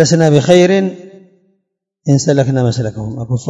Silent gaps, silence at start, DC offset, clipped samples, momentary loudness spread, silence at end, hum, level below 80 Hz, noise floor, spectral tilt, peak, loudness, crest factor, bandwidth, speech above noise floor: none; 0 s; under 0.1%; 0.5%; 13 LU; 0 s; none; -48 dBFS; -69 dBFS; -6 dB/octave; 0 dBFS; -12 LUFS; 12 dB; 10 kHz; 57 dB